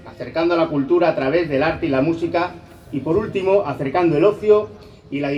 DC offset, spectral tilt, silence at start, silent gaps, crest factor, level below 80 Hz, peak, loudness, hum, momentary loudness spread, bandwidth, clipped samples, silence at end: under 0.1%; -8 dB/octave; 0 s; none; 16 dB; -48 dBFS; -2 dBFS; -19 LUFS; none; 11 LU; 7.6 kHz; under 0.1%; 0 s